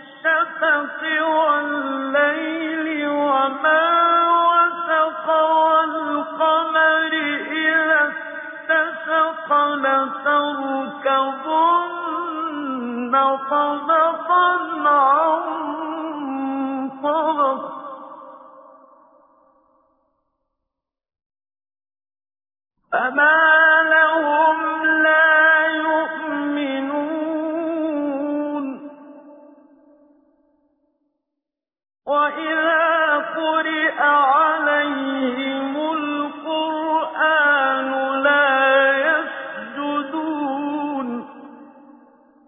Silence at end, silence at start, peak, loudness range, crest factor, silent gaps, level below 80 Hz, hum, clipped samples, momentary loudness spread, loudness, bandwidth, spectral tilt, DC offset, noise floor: 0.85 s; 0 s; -4 dBFS; 10 LU; 16 dB; 21.26-21.30 s; -74 dBFS; none; under 0.1%; 11 LU; -18 LUFS; 3.8 kHz; -6.5 dB/octave; under 0.1%; -84 dBFS